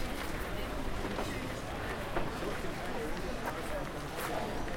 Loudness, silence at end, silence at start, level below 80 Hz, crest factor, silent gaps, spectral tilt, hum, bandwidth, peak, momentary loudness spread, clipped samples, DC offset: -38 LUFS; 0 s; 0 s; -44 dBFS; 16 dB; none; -5 dB/octave; none; 16.5 kHz; -20 dBFS; 2 LU; under 0.1%; under 0.1%